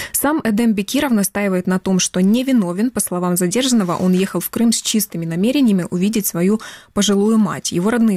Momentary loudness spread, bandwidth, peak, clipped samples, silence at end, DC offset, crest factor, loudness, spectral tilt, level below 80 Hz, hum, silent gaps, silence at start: 4 LU; 16 kHz; -6 dBFS; under 0.1%; 0 s; under 0.1%; 10 dB; -17 LUFS; -4.5 dB/octave; -50 dBFS; none; none; 0 s